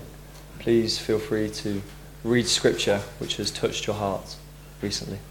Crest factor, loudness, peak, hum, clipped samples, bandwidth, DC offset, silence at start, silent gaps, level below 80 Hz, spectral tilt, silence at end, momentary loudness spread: 22 dB; -26 LUFS; -6 dBFS; none; under 0.1%; 18 kHz; under 0.1%; 0 s; none; -46 dBFS; -4 dB/octave; 0 s; 20 LU